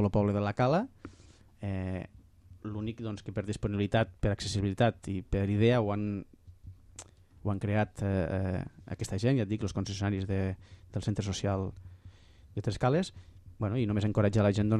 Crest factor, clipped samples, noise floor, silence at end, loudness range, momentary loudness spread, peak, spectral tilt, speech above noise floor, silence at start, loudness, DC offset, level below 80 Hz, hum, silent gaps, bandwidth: 18 dB; under 0.1%; -57 dBFS; 0 s; 5 LU; 15 LU; -14 dBFS; -7 dB/octave; 27 dB; 0 s; -32 LUFS; under 0.1%; -50 dBFS; none; none; 11 kHz